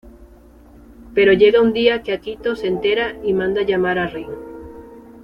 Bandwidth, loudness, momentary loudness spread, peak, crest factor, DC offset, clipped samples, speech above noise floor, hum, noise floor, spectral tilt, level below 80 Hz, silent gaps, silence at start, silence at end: 5.6 kHz; -17 LUFS; 20 LU; -2 dBFS; 18 dB; under 0.1%; under 0.1%; 28 dB; none; -45 dBFS; -7 dB/octave; -46 dBFS; none; 0.05 s; 0.05 s